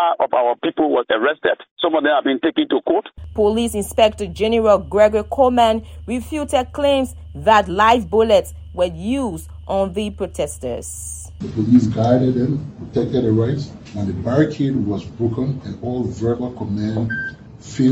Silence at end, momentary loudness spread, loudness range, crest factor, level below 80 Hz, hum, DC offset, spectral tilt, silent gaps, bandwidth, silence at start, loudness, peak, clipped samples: 0 s; 12 LU; 5 LU; 18 dB; -40 dBFS; none; under 0.1%; -6 dB/octave; 1.71-1.76 s; 16.5 kHz; 0 s; -19 LUFS; 0 dBFS; under 0.1%